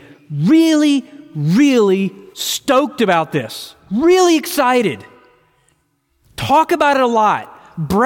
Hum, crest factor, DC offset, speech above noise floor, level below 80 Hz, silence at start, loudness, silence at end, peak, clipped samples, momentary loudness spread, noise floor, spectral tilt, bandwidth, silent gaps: none; 14 dB; under 0.1%; 49 dB; -50 dBFS; 0.3 s; -15 LUFS; 0 s; -2 dBFS; under 0.1%; 16 LU; -63 dBFS; -5 dB/octave; 17 kHz; none